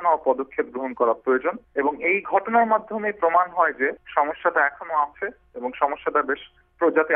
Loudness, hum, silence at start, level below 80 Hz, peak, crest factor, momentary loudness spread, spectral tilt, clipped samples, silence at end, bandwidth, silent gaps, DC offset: -23 LUFS; none; 0 s; -62 dBFS; -4 dBFS; 18 dB; 8 LU; -8.5 dB/octave; under 0.1%; 0 s; 3.7 kHz; none; under 0.1%